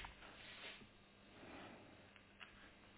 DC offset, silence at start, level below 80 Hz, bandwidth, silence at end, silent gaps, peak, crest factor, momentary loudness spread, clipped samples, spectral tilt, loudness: under 0.1%; 0 s; -72 dBFS; 4 kHz; 0 s; none; -40 dBFS; 20 dB; 10 LU; under 0.1%; -2 dB/octave; -58 LUFS